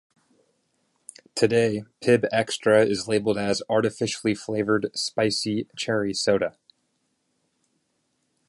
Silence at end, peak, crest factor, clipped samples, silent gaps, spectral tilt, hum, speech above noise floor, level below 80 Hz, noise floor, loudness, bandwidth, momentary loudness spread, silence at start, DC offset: 2 s; -6 dBFS; 20 dB; under 0.1%; none; -4.5 dB/octave; none; 50 dB; -62 dBFS; -73 dBFS; -24 LUFS; 11.5 kHz; 7 LU; 1.35 s; under 0.1%